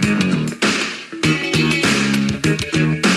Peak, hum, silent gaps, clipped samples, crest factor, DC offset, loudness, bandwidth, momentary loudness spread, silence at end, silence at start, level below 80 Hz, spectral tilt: -2 dBFS; none; none; under 0.1%; 14 dB; under 0.1%; -17 LUFS; 13 kHz; 4 LU; 0 s; 0 s; -44 dBFS; -4.5 dB/octave